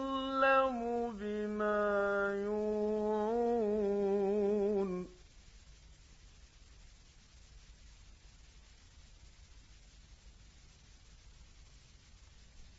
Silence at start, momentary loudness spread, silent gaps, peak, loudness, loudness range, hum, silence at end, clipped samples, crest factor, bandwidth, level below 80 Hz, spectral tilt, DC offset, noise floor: 0 s; 8 LU; none; -18 dBFS; -34 LUFS; 8 LU; none; 0.1 s; under 0.1%; 18 dB; 7.6 kHz; -60 dBFS; -4.5 dB/octave; under 0.1%; -59 dBFS